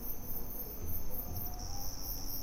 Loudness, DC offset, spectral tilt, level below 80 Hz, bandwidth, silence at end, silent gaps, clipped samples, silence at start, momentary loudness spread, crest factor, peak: -41 LUFS; under 0.1%; -4 dB/octave; -44 dBFS; 16 kHz; 0 s; none; under 0.1%; 0 s; 2 LU; 12 dB; -24 dBFS